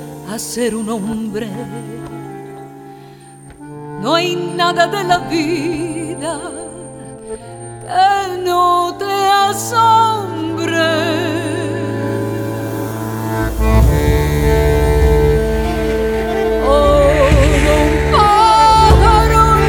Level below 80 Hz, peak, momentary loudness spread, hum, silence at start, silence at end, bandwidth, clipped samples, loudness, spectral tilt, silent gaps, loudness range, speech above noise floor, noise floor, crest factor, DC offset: -22 dBFS; 0 dBFS; 19 LU; none; 0 s; 0 s; 19.5 kHz; under 0.1%; -14 LUFS; -5.5 dB/octave; none; 10 LU; 22 dB; -38 dBFS; 14 dB; under 0.1%